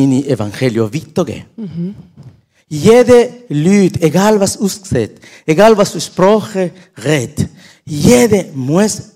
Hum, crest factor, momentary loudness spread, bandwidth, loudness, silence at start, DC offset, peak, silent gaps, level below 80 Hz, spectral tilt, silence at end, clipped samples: none; 12 dB; 14 LU; 16.5 kHz; -12 LUFS; 0 s; under 0.1%; 0 dBFS; none; -44 dBFS; -5.5 dB/octave; 0.1 s; 1%